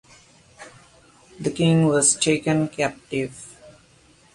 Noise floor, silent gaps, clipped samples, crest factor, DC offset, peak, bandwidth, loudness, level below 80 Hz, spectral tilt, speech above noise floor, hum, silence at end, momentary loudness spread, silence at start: -55 dBFS; none; under 0.1%; 20 dB; under 0.1%; -4 dBFS; 11.5 kHz; -21 LUFS; -58 dBFS; -4.5 dB/octave; 34 dB; none; 0.65 s; 15 LU; 0.6 s